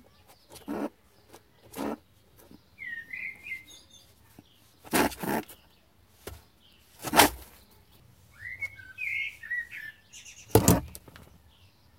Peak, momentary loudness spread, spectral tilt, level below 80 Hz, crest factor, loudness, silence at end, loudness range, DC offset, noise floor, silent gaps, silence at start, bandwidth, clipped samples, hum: -2 dBFS; 25 LU; -4 dB/octave; -52 dBFS; 30 dB; -29 LUFS; 0.75 s; 12 LU; under 0.1%; -62 dBFS; none; 0.5 s; 16.5 kHz; under 0.1%; none